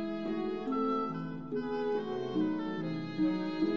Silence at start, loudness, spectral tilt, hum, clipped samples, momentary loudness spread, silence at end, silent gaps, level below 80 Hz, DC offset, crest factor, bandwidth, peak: 0 s; -34 LUFS; -8 dB/octave; none; under 0.1%; 5 LU; 0 s; none; -64 dBFS; 0.2%; 12 dB; 6.6 kHz; -20 dBFS